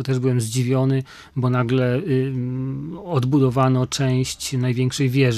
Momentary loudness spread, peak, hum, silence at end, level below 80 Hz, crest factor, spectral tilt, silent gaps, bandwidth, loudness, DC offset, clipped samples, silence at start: 7 LU; -4 dBFS; none; 0 s; -52 dBFS; 16 dB; -6.5 dB/octave; none; 13.5 kHz; -21 LUFS; under 0.1%; under 0.1%; 0 s